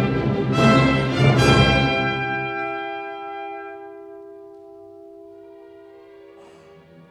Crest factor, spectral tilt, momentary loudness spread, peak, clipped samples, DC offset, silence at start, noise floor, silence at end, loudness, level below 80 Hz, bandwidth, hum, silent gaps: 18 dB; -6 dB/octave; 24 LU; -2 dBFS; under 0.1%; under 0.1%; 0 s; -47 dBFS; 1.3 s; -19 LUFS; -38 dBFS; 12 kHz; none; none